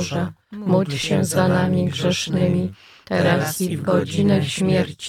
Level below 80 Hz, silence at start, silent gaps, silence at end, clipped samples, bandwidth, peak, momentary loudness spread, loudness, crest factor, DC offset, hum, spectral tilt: -58 dBFS; 0 s; none; 0 s; under 0.1%; 15.5 kHz; -4 dBFS; 7 LU; -20 LUFS; 16 dB; under 0.1%; none; -5.5 dB/octave